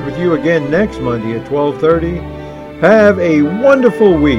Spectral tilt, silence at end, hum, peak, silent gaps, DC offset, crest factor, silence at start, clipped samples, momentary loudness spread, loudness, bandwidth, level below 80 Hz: -7.5 dB/octave; 0 s; none; 0 dBFS; none; under 0.1%; 12 dB; 0 s; 0.4%; 12 LU; -12 LUFS; 11 kHz; -34 dBFS